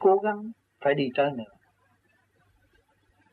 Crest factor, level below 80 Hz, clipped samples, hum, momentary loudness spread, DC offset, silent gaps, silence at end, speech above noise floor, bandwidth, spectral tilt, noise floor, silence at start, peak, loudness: 18 dB; -72 dBFS; under 0.1%; none; 17 LU; under 0.1%; none; 1.9 s; 42 dB; 4.4 kHz; -8.5 dB/octave; -67 dBFS; 0 s; -10 dBFS; -27 LUFS